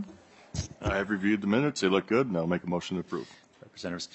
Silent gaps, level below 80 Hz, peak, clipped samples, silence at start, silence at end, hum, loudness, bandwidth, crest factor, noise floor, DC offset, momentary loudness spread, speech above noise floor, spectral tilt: none; -52 dBFS; -10 dBFS; under 0.1%; 0 s; 0.1 s; none; -29 LUFS; 8.4 kHz; 20 dB; -52 dBFS; under 0.1%; 13 LU; 24 dB; -5.5 dB/octave